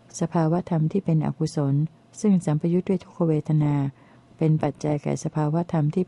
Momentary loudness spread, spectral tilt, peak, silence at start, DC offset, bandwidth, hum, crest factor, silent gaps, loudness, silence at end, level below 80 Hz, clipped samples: 5 LU; -8 dB/octave; -10 dBFS; 0.15 s; under 0.1%; 11 kHz; none; 14 dB; none; -24 LUFS; 0.05 s; -58 dBFS; under 0.1%